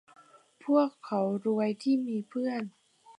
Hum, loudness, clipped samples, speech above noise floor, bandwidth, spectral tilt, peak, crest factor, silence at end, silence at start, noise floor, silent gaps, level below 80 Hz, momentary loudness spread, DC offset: none; -30 LUFS; under 0.1%; 29 dB; 10.5 kHz; -7.5 dB/octave; -12 dBFS; 18 dB; 0.05 s; 0.65 s; -58 dBFS; none; -84 dBFS; 10 LU; under 0.1%